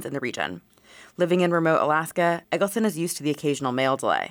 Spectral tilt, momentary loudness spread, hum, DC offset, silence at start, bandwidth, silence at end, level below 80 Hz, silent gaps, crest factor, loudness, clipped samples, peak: -5 dB/octave; 9 LU; none; under 0.1%; 0 s; 19 kHz; 0 s; -70 dBFS; none; 16 dB; -24 LUFS; under 0.1%; -10 dBFS